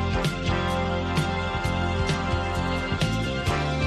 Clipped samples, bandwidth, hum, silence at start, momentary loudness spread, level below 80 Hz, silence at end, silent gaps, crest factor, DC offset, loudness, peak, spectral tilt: under 0.1%; 13.5 kHz; none; 0 s; 1 LU; -36 dBFS; 0 s; none; 14 dB; under 0.1%; -26 LUFS; -12 dBFS; -5.5 dB/octave